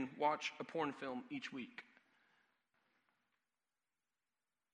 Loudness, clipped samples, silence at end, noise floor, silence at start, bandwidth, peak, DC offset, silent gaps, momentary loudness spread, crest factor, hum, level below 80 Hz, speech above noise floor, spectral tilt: -43 LUFS; under 0.1%; 2.9 s; under -90 dBFS; 0 s; 11 kHz; -22 dBFS; under 0.1%; none; 13 LU; 24 dB; none; under -90 dBFS; over 47 dB; -4.5 dB/octave